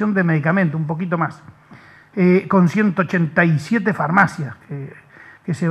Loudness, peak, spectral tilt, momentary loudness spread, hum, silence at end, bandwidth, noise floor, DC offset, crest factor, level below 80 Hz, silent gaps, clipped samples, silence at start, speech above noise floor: -18 LUFS; 0 dBFS; -8 dB/octave; 16 LU; none; 0 s; 9 kHz; -45 dBFS; under 0.1%; 18 dB; -64 dBFS; none; under 0.1%; 0 s; 27 dB